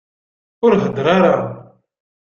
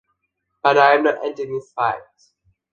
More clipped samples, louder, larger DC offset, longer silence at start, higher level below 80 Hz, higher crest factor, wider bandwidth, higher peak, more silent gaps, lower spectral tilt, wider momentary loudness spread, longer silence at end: neither; first, -15 LUFS vs -18 LUFS; neither; about the same, 0.6 s vs 0.65 s; first, -54 dBFS vs -66 dBFS; about the same, 16 dB vs 20 dB; about the same, 7 kHz vs 7.4 kHz; about the same, -2 dBFS vs 0 dBFS; neither; first, -7.5 dB/octave vs -5 dB/octave; second, 7 LU vs 14 LU; about the same, 0.6 s vs 0.7 s